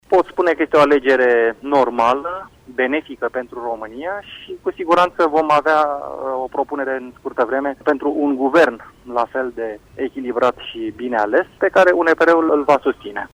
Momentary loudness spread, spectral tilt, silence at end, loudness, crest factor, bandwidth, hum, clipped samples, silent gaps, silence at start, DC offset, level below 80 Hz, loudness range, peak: 14 LU; -5.5 dB/octave; 0.05 s; -18 LUFS; 16 dB; 12.5 kHz; none; under 0.1%; none; 0.1 s; under 0.1%; -54 dBFS; 4 LU; -2 dBFS